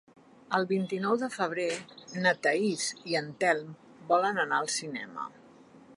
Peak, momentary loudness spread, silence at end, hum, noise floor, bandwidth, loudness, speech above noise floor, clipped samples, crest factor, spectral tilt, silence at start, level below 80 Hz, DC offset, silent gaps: -10 dBFS; 13 LU; 0 s; none; -55 dBFS; 11.5 kHz; -30 LUFS; 25 dB; under 0.1%; 22 dB; -3.5 dB/octave; 0.5 s; -80 dBFS; under 0.1%; none